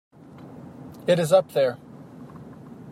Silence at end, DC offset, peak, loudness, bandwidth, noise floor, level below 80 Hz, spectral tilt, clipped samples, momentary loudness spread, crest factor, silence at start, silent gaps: 0 s; under 0.1%; -6 dBFS; -22 LUFS; 15.5 kHz; -44 dBFS; -68 dBFS; -5.5 dB/octave; under 0.1%; 24 LU; 20 dB; 0.4 s; none